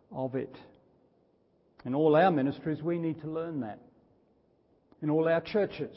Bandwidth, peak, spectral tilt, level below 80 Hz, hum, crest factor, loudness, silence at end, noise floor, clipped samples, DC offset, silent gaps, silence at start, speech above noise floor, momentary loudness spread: 5.8 kHz; -12 dBFS; -11 dB/octave; -70 dBFS; none; 20 dB; -30 LUFS; 0 s; -68 dBFS; under 0.1%; under 0.1%; none; 0.1 s; 39 dB; 16 LU